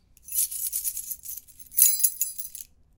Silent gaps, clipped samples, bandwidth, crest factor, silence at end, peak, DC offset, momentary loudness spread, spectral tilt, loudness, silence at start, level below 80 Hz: none; under 0.1%; 19 kHz; 26 dB; 0.35 s; -2 dBFS; under 0.1%; 19 LU; 3.5 dB/octave; -23 LUFS; 0.3 s; -62 dBFS